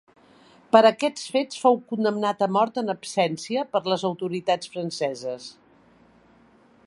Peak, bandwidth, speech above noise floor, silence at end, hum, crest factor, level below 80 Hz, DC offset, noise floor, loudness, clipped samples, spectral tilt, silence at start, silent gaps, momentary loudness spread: -2 dBFS; 11.5 kHz; 33 dB; 1.35 s; none; 24 dB; -72 dBFS; under 0.1%; -56 dBFS; -24 LUFS; under 0.1%; -4.5 dB/octave; 0.75 s; none; 10 LU